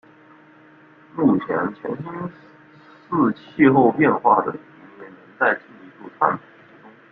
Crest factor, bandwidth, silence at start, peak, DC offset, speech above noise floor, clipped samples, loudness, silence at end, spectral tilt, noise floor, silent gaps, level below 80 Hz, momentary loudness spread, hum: 20 dB; 4.5 kHz; 1.15 s; -2 dBFS; under 0.1%; 30 dB; under 0.1%; -20 LUFS; 0.75 s; -10.5 dB/octave; -49 dBFS; none; -62 dBFS; 19 LU; none